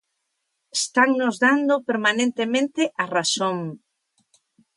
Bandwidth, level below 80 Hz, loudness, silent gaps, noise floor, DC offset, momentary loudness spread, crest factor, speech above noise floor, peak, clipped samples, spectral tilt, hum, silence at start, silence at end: 11.5 kHz; -76 dBFS; -21 LUFS; none; -76 dBFS; under 0.1%; 7 LU; 18 dB; 55 dB; -4 dBFS; under 0.1%; -3 dB/octave; none; 0.75 s; 1 s